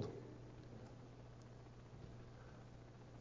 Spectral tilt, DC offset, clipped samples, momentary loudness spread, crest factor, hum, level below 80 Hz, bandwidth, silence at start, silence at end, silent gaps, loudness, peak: -7 dB/octave; under 0.1%; under 0.1%; 4 LU; 22 dB; 60 Hz at -60 dBFS; -66 dBFS; 7.2 kHz; 0 s; 0 s; none; -58 LUFS; -32 dBFS